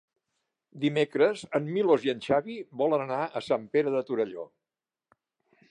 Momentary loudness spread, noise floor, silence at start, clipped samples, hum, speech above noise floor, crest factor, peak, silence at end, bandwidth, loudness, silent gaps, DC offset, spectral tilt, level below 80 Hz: 7 LU; under -90 dBFS; 0.75 s; under 0.1%; none; over 63 dB; 18 dB; -10 dBFS; 1.25 s; 10 kHz; -28 LUFS; none; under 0.1%; -6.5 dB/octave; -72 dBFS